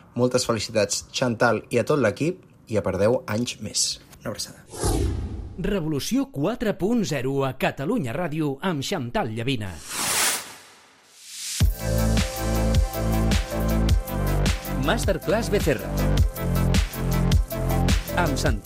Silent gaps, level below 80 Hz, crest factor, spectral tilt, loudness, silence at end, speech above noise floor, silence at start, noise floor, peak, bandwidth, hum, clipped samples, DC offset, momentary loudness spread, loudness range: none; -30 dBFS; 16 dB; -5 dB/octave; -24 LUFS; 0 s; 28 dB; 0.15 s; -52 dBFS; -8 dBFS; 16 kHz; none; under 0.1%; under 0.1%; 7 LU; 3 LU